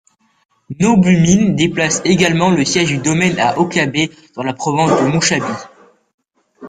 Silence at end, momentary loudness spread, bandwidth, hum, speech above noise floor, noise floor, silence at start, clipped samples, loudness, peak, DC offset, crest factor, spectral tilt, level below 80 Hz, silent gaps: 0 s; 10 LU; 9.6 kHz; none; 26 dB; -39 dBFS; 0.7 s; under 0.1%; -14 LUFS; 0 dBFS; under 0.1%; 14 dB; -4.5 dB/octave; -46 dBFS; 6.14-6.18 s